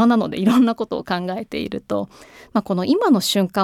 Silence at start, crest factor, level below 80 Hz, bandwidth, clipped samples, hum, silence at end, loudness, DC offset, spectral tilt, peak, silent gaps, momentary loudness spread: 0 s; 14 dB; -56 dBFS; 16 kHz; under 0.1%; none; 0 s; -20 LUFS; under 0.1%; -5.5 dB/octave; -4 dBFS; none; 10 LU